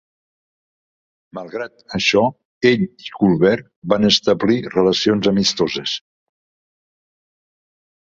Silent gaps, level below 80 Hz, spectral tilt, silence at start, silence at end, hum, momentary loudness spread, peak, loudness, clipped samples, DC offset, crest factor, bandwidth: 2.45-2.61 s, 3.76-3.82 s; -54 dBFS; -4.5 dB/octave; 1.35 s; 2.2 s; none; 14 LU; -2 dBFS; -17 LUFS; under 0.1%; under 0.1%; 18 dB; 7.8 kHz